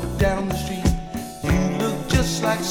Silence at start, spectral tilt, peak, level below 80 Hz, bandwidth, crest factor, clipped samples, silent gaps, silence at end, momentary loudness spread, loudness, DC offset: 0 s; -5 dB/octave; -6 dBFS; -30 dBFS; 18 kHz; 16 dB; under 0.1%; none; 0 s; 6 LU; -23 LUFS; under 0.1%